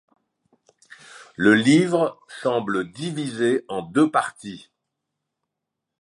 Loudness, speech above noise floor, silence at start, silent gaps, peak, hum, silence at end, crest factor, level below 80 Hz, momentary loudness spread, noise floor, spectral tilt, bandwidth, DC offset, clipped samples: -21 LUFS; 62 dB; 1.15 s; none; -4 dBFS; none; 1.4 s; 20 dB; -66 dBFS; 18 LU; -83 dBFS; -5.5 dB/octave; 11.5 kHz; under 0.1%; under 0.1%